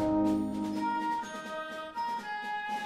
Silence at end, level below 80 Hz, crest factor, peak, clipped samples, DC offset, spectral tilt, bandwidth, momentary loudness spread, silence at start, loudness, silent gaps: 0 s; -60 dBFS; 14 dB; -18 dBFS; under 0.1%; under 0.1%; -5.5 dB/octave; 14.5 kHz; 9 LU; 0 s; -33 LUFS; none